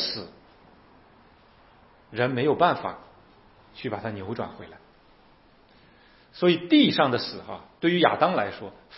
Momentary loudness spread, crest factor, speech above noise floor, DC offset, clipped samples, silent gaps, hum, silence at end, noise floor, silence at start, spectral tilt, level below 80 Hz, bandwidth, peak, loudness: 21 LU; 24 dB; 32 dB; under 0.1%; under 0.1%; none; none; 0 s; -57 dBFS; 0 s; -9 dB/octave; -64 dBFS; 5.8 kHz; -4 dBFS; -24 LUFS